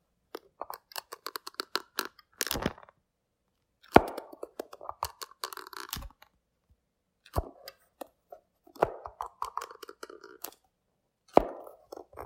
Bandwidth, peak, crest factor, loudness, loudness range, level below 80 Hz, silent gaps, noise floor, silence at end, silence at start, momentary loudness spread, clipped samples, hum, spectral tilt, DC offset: 16.5 kHz; 0 dBFS; 36 dB; -33 LUFS; 11 LU; -52 dBFS; none; -80 dBFS; 0 s; 0.6 s; 22 LU; under 0.1%; none; -4 dB/octave; under 0.1%